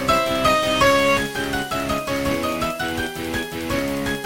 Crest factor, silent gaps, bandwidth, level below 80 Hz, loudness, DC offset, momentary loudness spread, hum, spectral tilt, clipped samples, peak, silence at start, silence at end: 16 dB; none; 17 kHz; -40 dBFS; -21 LUFS; 0.5%; 9 LU; none; -4 dB/octave; under 0.1%; -4 dBFS; 0 s; 0 s